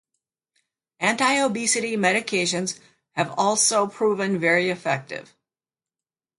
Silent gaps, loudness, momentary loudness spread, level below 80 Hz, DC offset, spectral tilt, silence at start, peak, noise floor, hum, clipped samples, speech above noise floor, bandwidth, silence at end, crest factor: none; -22 LUFS; 10 LU; -72 dBFS; under 0.1%; -2.5 dB/octave; 1 s; -6 dBFS; under -90 dBFS; none; under 0.1%; over 68 dB; 11.5 kHz; 1.15 s; 18 dB